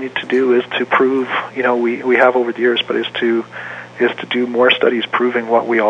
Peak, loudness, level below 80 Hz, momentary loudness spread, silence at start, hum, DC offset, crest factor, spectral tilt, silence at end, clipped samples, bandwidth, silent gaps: 0 dBFS; -15 LUFS; -68 dBFS; 7 LU; 0 s; none; under 0.1%; 16 dB; -5.5 dB/octave; 0 s; under 0.1%; 7.4 kHz; none